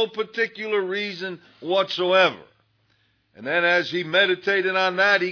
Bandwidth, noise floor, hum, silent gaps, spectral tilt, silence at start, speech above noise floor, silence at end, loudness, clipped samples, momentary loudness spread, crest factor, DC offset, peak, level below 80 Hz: 5.4 kHz; -65 dBFS; none; none; -4.5 dB/octave; 0 s; 43 dB; 0 s; -21 LUFS; under 0.1%; 13 LU; 18 dB; under 0.1%; -4 dBFS; -80 dBFS